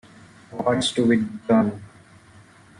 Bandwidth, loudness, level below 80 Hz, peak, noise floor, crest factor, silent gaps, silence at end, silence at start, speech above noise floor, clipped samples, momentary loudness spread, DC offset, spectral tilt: 11 kHz; -22 LUFS; -60 dBFS; -8 dBFS; -50 dBFS; 16 dB; none; 0.95 s; 0.5 s; 29 dB; under 0.1%; 13 LU; under 0.1%; -5 dB/octave